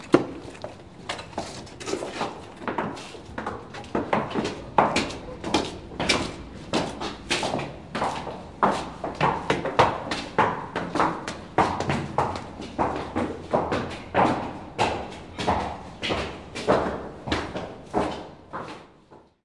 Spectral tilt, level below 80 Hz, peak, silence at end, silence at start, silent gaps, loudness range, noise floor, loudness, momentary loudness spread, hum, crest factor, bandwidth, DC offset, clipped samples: -4.5 dB/octave; -48 dBFS; 0 dBFS; 0.2 s; 0 s; none; 5 LU; -53 dBFS; -27 LUFS; 13 LU; none; 26 dB; 11.5 kHz; 0.1%; under 0.1%